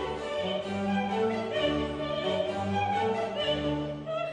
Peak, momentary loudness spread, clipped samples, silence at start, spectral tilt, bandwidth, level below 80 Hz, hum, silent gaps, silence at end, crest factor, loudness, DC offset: -16 dBFS; 4 LU; under 0.1%; 0 s; -6 dB/octave; 10 kHz; -52 dBFS; none; none; 0 s; 14 dB; -30 LUFS; under 0.1%